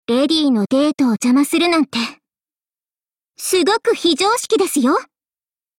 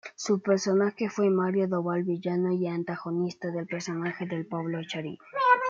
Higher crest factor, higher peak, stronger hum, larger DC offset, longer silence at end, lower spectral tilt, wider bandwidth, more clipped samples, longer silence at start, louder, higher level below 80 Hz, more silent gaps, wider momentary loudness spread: second, 14 dB vs 20 dB; first, -4 dBFS vs -8 dBFS; neither; neither; first, 0.75 s vs 0 s; second, -3.5 dB/octave vs -6 dB/octave; first, 17 kHz vs 7.8 kHz; neither; about the same, 0.1 s vs 0.05 s; first, -16 LUFS vs -29 LUFS; first, -60 dBFS vs -78 dBFS; neither; second, 6 LU vs 9 LU